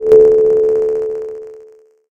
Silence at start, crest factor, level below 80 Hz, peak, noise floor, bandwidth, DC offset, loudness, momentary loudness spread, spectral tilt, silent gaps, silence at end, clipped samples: 0 s; 12 dB; -46 dBFS; 0 dBFS; -43 dBFS; 2.8 kHz; under 0.1%; -12 LUFS; 19 LU; -7.5 dB/octave; none; 0.5 s; under 0.1%